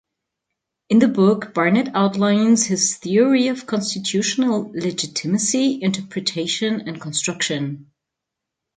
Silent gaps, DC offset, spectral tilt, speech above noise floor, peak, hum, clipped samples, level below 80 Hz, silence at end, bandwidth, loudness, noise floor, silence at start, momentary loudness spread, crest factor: none; under 0.1%; -4 dB/octave; 64 dB; -2 dBFS; none; under 0.1%; -66 dBFS; 0.95 s; 9.6 kHz; -19 LUFS; -83 dBFS; 0.9 s; 8 LU; 18 dB